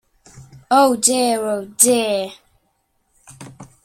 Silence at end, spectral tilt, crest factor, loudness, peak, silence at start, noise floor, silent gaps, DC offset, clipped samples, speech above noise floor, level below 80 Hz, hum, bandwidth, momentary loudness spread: 0.2 s; -2 dB/octave; 20 dB; -16 LUFS; 0 dBFS; 0.35 s; -67 dBFS; none; under 0.1%; under 0.1%; 50 dB; -60 dBFS; none; 16.5 kHz; 11 LU